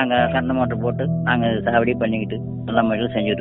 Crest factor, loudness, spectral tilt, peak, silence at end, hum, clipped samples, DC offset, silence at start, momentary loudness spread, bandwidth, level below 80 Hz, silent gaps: 16 dB; -20 LUFS; -5 dB/octave; -4 dBFS; 0 s; none; under 0.1%; under 0.1%; 0 s; 4 LU; 4 kHz; -48 dBFS; none